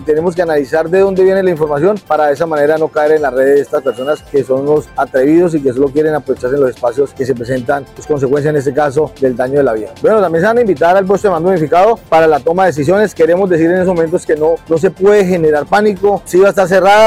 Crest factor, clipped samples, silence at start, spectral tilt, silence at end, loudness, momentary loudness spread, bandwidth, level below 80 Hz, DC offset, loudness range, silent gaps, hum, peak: 10 dB; under 0.1%; 0 s; -6.5 dB/octave; 0 s; -12 LUFS; 6 LU; 15.5 kHz; -44 dBFS; under 0.1%; 4 LU; none; none; -2 dBFS